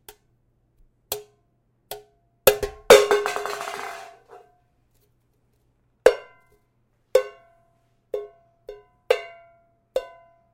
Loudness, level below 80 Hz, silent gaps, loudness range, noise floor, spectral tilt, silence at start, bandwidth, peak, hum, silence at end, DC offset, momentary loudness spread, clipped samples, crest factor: -22 LUFS; -54 dBFS; none; 8 LU; -67 dBFS; -2 dB/octave; 1.1 s; 16.5 kHz; 0 dBFS; none; 0.5 s; under 0.1%; 29 LU; under 0.1%; 24 dB